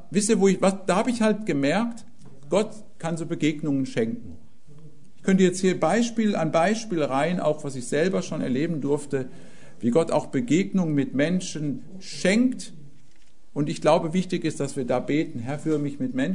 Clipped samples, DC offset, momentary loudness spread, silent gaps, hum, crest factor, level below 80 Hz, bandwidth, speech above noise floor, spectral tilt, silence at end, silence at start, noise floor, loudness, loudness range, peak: under 0.1%; 1%; 10 LU; none; none; 18 dB; -62 dBFS; 11 kHz; 35 dB; -5.5 dB/octave; 0 s; 0.1 s; -59 dBFS; -24 LUFS; 3 LU; -6 dBFS